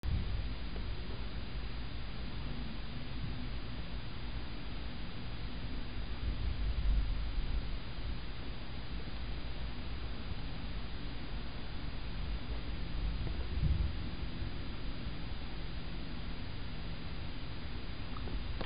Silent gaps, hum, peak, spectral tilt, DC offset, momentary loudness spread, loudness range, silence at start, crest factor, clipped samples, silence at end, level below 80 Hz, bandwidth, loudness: none; none; -20 dBFS; -5 dB/octave; 0.9%; 6 LU; 4 LU; 0.05 s; 18 dB; under 0.1%; 0 s; -40 dBFS; 5.2 kHz; -42 LUFS